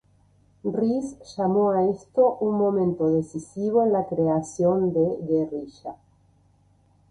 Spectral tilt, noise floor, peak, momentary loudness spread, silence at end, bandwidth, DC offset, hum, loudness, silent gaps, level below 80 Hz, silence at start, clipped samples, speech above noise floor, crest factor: -8.5 dB/octave; -61 dBFS; -8 dBFS; 13 LU; 1.15 s; 11 kHz; under 0.1%; none; -24 LUFS; none; -60 dBFS; 0.65 s; under 0.1%; 38 dB; 16 dB